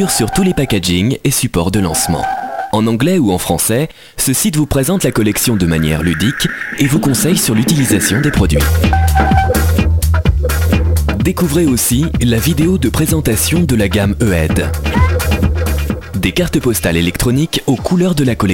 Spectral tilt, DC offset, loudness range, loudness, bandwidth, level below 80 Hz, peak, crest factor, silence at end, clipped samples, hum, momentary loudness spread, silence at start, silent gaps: -5 dB/octave; under 0.1%; 2 LU; -13 LUFS; 17 kHz; -22 dBFS; 0 dBFS; 12 dB; 0 s; under 0.1%; none; 4 LU; 0 s; none